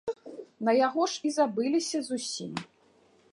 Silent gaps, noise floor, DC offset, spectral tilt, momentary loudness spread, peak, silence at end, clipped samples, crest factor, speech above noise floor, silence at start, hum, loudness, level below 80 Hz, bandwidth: none; -63 dBFS; under 0.1%; -3.5 dB/octave; 14 LU; -12 dBFS; 0.65 s; under 0.1%; 18 dB; 35 dB; 0.05 s; none; -29 LUFS; -76 dBFS; 11.5 kHz